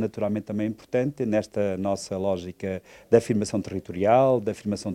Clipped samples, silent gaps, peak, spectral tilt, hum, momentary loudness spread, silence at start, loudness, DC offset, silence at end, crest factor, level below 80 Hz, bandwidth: under 0.1%; none; -4 dBFS; -6.5 dB/octave; none; 11 LU; 0 s; -25 LUFS; under 0.1%; 0 s; 20 dB; -60 dBFS; 14 kHz